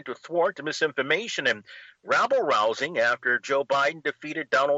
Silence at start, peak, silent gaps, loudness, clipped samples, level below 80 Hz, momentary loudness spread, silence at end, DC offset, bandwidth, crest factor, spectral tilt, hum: 0.05 s; -10 dBFS; none; -25 LUFS; under 0.1%; -76 dBFS; 8 LU; 0 s; under 0.1%; 8 kHz; 16 dB; -3 dB/octave; none